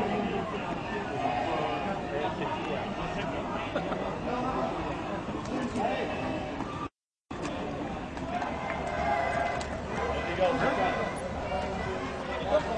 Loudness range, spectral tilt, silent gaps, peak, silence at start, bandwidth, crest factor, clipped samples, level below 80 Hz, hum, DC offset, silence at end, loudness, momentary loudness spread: 4 LU; -6 dB/octave; none; -14 dBFS; 0 s; 10.5 kHz; 18 dB; under 0.1%; -48 dBFS; none; under 0.1%; 0 s; -32 LUFS; 7 LU